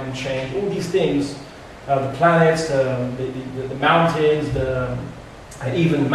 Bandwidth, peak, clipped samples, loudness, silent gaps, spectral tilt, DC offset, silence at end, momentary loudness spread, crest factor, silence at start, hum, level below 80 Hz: 13 kHz; -4 dBFS; under 0.1%; -20 LUFS; none; -6.5 dB/octave; under 0.1%; 0 s; 16 LU; 16 dB; 0 s; none; -44 dBFS